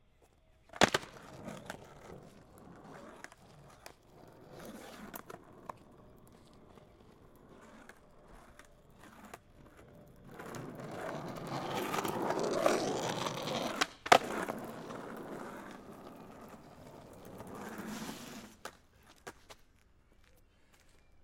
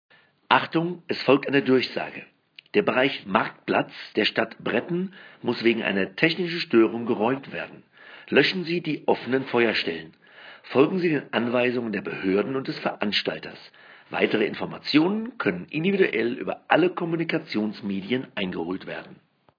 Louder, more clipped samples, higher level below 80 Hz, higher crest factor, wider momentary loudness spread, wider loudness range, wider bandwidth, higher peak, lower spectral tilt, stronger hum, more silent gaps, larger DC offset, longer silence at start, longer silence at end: second, -36 LUFS vs -24 LUFS; neither; first, -66 dBFS vs -72 dBFS; first, 36 dB vs 24 dB; first, 27 LU vs 11 LU; first, 23 LU vs 2 LU; first, 16.5 kHz vs 5.4 kHz; about the same, -4 dBFS vs -2 dBFS; second, -3.5 dB/octave vs -7 dB/octave; neither; neither; neither; first, 0.75 s vs 0.5 s; second, 0 s vs 0.45 s